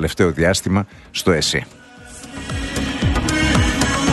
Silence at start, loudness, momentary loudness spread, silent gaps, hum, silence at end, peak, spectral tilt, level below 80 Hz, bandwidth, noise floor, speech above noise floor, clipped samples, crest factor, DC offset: 0 s; -18 LUFS; 16 LU; none; none; 0 s; -2 dBFS; -4.5 dB/octave; -30 dBFS; 12.5 kHz; -38 dBFS; 20 dB; under 0.1%; 18 dB; under 0.1%